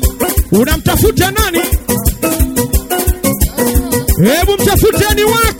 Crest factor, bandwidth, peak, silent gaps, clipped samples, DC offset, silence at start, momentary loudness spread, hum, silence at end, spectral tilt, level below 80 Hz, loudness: 12 dB; 17.5 kHz; 0 dBFS; none; under 0.1%; under 0.1%; 0 s; 4 LU; none; 0 s; -4.5 dB/octave; -18 dBFS; -12 LUFS